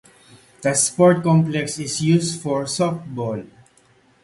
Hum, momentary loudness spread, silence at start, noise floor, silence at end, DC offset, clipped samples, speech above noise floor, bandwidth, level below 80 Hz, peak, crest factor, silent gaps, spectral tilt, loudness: none; 12 LU; 0.6 s; -56 dBFS; 0.75 s; under 0.1%; under 0.1%; 37 dB; 11.5 kHz; -58 dBFS; -2 dBFS; 18 dB; none; -5 dB/octave; -19 LUFS